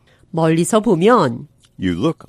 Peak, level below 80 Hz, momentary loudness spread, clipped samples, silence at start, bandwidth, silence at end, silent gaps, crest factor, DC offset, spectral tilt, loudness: 0 dBFS; -50 dBFS; 13 LU; under 0.1%; 0.35 s; 15.5 kHz; 0.15 s; none; 16 dB; under 0.1%; -6 dB/octave; -16 LUFS